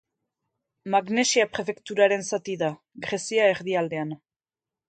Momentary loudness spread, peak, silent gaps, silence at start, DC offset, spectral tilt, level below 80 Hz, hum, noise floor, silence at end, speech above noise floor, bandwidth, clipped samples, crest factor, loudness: 12 LU; -6 dBFS; none; 0.85 s; under 0.1%; -3.5 dB/octave; -70 dBFS; none; under -90 dBFS; 0.75 s; over 65 dB; 9.4 kHz; under 0.1%; 20 dB; -25 LUFS